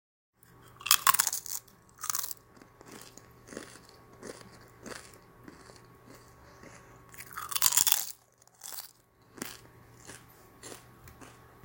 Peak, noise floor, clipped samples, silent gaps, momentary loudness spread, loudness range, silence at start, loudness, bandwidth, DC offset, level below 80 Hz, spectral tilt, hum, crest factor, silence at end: -2 dBFS; -61 dBFS; under 0.1%; none; 29 LU; 19 LU; 0.8 s; -28 LUFS; 17.5 kHz; under 0.1%; -68 dBFS; 0.5 dB/octave; none; 34 dB; 0.3 s